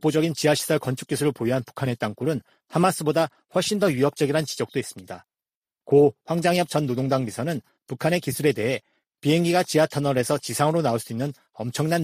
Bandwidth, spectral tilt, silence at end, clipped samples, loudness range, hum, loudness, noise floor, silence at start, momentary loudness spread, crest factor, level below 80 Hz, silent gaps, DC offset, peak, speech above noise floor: 15.5 kHz; -5.5 dB/octave; 0 s; under 0.1%; 2 LU; none; -24 LUFS; under -90 dBFS; 0.05 s; 10 LU; 18 dB; -62 dBFS; 5.55-5.63 s; under 0.1%; -4 dBFS; over 67 dB